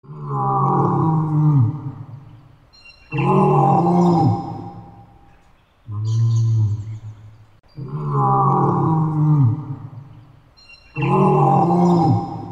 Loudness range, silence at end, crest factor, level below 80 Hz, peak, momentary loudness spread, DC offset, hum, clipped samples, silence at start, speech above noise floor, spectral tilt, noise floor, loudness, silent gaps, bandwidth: 5 LU; 0 s; 14 dB; -50 dBFS; -4 dBFS; 18 LU; under 0.1%; none; under 0.1%; 0.1 s; 38 dB; -9.5 dB/octave; -53 dBFS; -18 LUFS; none; 7.6 kHz